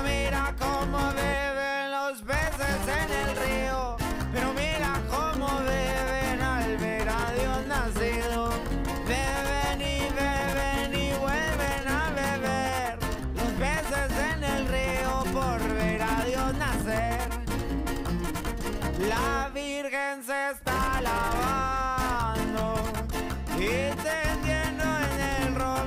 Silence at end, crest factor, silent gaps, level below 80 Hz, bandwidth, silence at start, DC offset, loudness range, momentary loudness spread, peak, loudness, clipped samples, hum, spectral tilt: 0 s; 12 dB; none; -34 dBFS; 16 kHz; 0 s; under 0.1%; 2 LU; 4 LU; -16 dBFS; -28 LUFS; under 0.1%; none; -4.5 dB/octave